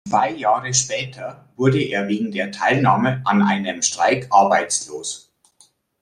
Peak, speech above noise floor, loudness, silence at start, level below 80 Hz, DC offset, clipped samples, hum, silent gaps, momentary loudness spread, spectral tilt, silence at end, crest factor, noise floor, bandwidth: -2 dBFS; 38 dB; -19 LUFS; 0.05 s; -60 dBFS; under 0.1%; under 0.1%; none; none; 13 LU; -4 dB/octave; 0.85 s; 18 dB; -57 dBFS; 11.5 kHz